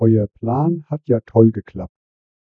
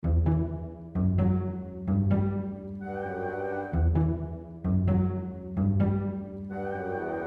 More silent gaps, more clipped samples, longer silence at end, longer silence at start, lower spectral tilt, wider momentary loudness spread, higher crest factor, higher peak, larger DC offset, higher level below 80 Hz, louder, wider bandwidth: neither; neither; first, 0.6 s vs 0 s; about the same, 0 s vs 0.05 s; first, -13.5 dB/octave vs -11.5 dB/octave; first, 18 LU vs 10 LU; about the same, 18 dB vs 14 dB; first, 0 dBFS vs -14 dBFS; neither; second, -50 dBFS vs -38 dBFS; first, -18 LUFS vs -29 LUFS; second, 2.7 kHz vs 3.4 kHz